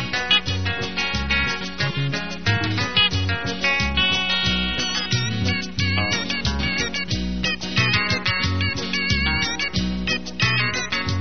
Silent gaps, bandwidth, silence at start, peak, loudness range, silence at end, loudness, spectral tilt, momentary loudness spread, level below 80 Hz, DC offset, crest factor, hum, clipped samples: none; 6.6 kHz; 0 s; -4 dBFS; 2 LU; 0 s; -21 LUFS; -2.5 dB/octave; 6 LU; -36 dBFS; 1%; 18 dB; none; under 0.1%